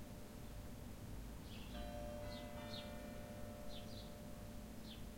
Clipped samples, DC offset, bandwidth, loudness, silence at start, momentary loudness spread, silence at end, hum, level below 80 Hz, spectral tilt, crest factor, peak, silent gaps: under 0.1%; under 0.1%; 16.5 kHz; -52 LUFS; 0 s; 4 LU; 0 s; none; -56 dBFS; -5 dB/octave; 14 dB; -36 dBFS; none